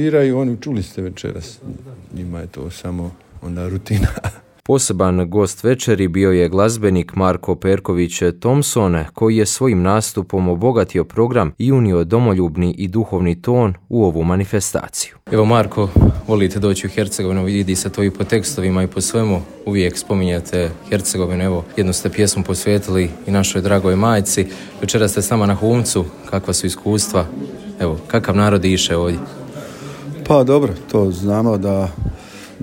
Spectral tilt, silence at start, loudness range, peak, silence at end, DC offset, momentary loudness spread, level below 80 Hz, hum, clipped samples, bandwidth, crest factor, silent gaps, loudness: -5.5 dB/octave; 0 s; 3 LU; 0 dBFS; 0 s; under 0.1%; 13 LU; -34 dBFS; none; under 0.1%; 17 kHz; 16 dB; none; -17 LUFS